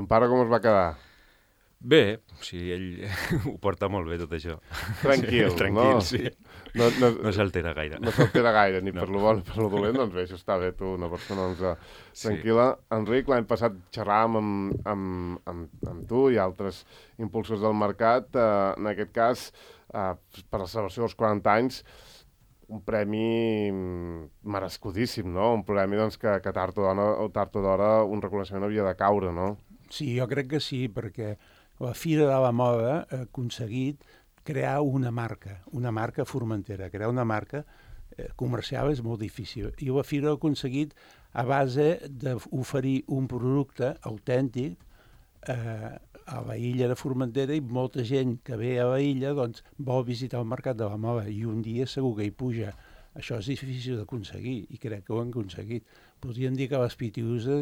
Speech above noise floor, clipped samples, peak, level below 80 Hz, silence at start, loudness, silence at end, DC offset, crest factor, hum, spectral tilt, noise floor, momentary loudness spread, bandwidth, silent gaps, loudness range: 36 dB; under 0.1%; -6 dBFS; -52 dBFS; 0 s; -28 LUFS; 0 s; under 0.1%; 22 dB; none; -7 dB/octave; -63 dBFS; 14 LU; 16.5 kHz; none; 7 LU